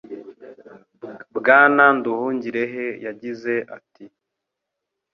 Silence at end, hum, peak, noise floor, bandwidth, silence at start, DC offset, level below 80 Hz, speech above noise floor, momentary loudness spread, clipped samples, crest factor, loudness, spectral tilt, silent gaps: 1.05 s; none; -2 dBFS; -82 dBFS; 6.6 kHz; 0.1 s; under 0.1%; -72 dBFS; 63 dB; 25 LU; under 0.1%; 20 dB; -18 LUFS; -7 dB/octave; none